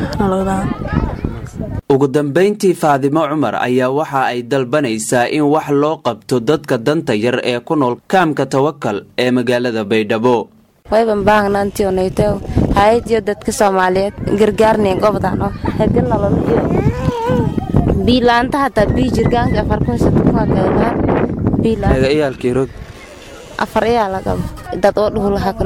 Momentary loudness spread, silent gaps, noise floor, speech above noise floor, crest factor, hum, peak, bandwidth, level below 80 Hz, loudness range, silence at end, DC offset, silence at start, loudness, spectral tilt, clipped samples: 7 LU; none; -34 dBFS; 20 dB; 12 dB; none; -2 dBFS; 16.5 kHz; -30 dBFS; 2 LU; 0 s; under 0.1%; 0 s; -15 LUFS; -6.5 dB/octave; under 0.1%